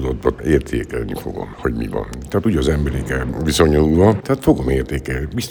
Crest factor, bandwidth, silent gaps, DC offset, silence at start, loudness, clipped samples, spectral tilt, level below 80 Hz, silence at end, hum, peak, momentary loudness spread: 16 dB; over 20 kHz; none; under 0.1%; 0 s; -18 LUFS; under 0.1%; -6.5 dB/octave; -28 dBFS; 0 s; none; 0 dBFS; 11 LU